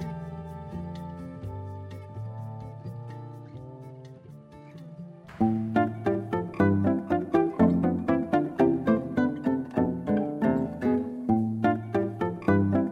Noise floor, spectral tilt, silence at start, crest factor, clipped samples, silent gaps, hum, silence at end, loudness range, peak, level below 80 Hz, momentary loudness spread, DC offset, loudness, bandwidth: -47 dBFS; -9.5 dB/octave; 0 s; 18 dB; under 0.1%; none; none; 0 s; 15 LU; -10 dBFS; -56 dBFS; 20 LU; under 0.1%; -27 LUFS; 6.8 kHz